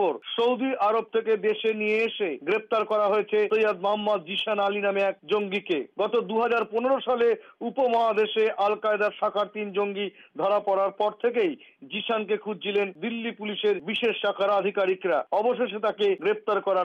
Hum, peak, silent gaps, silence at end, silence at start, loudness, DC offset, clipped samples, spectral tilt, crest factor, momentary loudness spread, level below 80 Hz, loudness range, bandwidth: none; -14 dBFS; none; 0 s; 0 s; -26 LUFS; under 0.1%; under 0.1%; -6 dB/octave; 12 dB; 6 LU; -76 dBFS; 3 LU; 6.8 kHz